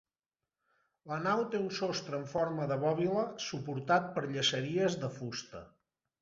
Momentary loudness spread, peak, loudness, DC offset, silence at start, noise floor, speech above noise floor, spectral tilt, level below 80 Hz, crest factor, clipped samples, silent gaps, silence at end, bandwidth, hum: 10 LU; -16 dBFS; -34 LUFS; under 0.1%; 1.05 s; under -90 dBFS; over 56 dB; -4 dB/octave; -72 dBFS; 20 dB; under 0.1%; none; 0.55 s; 7.6 kHz; none